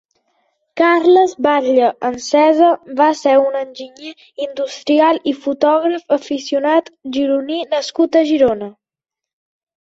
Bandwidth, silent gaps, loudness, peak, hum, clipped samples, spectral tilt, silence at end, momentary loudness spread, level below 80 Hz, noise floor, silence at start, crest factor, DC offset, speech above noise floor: 8 kHz; none; -15 LUFS; -2 dBFS; none; under 0.1%; -3.5 dB/octave; 1.1 s; 13 LU; -58 dBFS; -85 dBFS; 0.75 s; 14 dB; under 0.1%; 71 dB